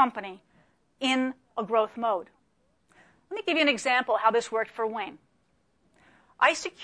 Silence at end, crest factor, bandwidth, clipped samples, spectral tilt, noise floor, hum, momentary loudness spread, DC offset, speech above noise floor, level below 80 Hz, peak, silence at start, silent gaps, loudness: 0 s; 20 dB; 10.5 kHz; under 0.1%; -2.5 dB/octave; -70 dBFS; none; 13 LU; under 0.1%; 44 dB; -74 dBFS; -8 dBFS; 0 s; none; -27 LUFS